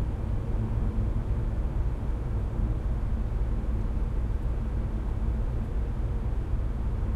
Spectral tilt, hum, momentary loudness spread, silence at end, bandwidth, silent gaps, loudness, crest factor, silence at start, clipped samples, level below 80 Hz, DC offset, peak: -9 dB/octave; none; 2 LU; 0 s; 4.5 kHz; none; -32 LUFS; 12 dB; 0 s; under 0.1%; -28 dBFS; under 0.1%; -16 dBFS